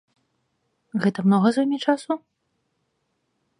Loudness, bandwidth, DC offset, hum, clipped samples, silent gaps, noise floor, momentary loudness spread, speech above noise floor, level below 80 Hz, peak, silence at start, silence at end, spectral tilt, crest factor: -22 LUFS; 10.5 kHz; under 0.1%; none; under 0.1%; none; -74 dBFS; 11 LU; 53 dB; -74 dBFS; -6 dBFS; 0.95 s; 1.45 s; -7 dB/octave; 20 dB